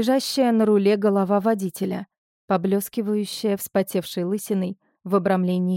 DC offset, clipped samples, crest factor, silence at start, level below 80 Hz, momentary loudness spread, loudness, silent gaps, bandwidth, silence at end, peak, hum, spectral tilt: under 0.1%; under 0.1%; 14 dB; 0 s; -68 dBFS; 8 LU; -22 LUFS; 2.18-2.48 s; 17 kHz; 0 s; -8 dBFS; none; -6 dB/octave